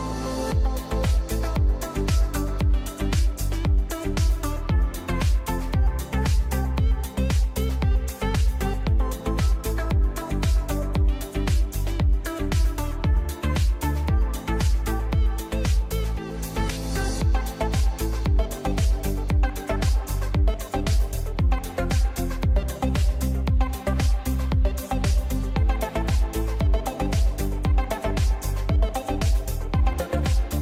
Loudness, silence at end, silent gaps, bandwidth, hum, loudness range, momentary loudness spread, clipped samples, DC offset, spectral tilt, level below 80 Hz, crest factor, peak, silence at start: -25 LUFS; 0 s; none; 16.5 kHz; none; 1 LU; 3 LU; under 0.1%; under 0.1%; -6 dB/octave; -24 dBFS; 12 dB; -10 dBFS; 0 s